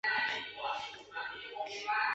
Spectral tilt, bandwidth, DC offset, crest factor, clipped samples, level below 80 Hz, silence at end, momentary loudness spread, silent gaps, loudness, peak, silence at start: 2.5 dB/octave; 8 kHz; under 0.1%; 16 dB; under 0.1%; -74 dBFS; 0 s; 9 LU; none; -37 LUFS; -22 dBFS; 0.05 s